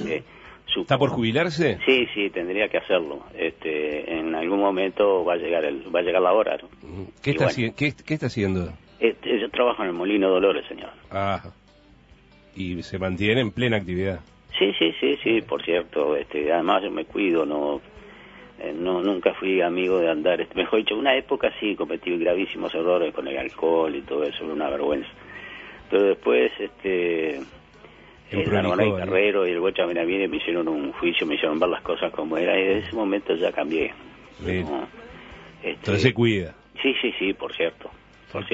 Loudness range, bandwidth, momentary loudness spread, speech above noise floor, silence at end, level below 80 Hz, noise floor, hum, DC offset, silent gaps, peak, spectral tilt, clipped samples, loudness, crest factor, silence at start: 3 LU; 8 kHz; 12 LU; 30 dB; 0 s; -54 dBFS; -54 dBFS; none; under 0.1%; none; -4 dBFS; -6.5 dB/octave; under 0.1%; -24 LUFS; 20 dB; 0 s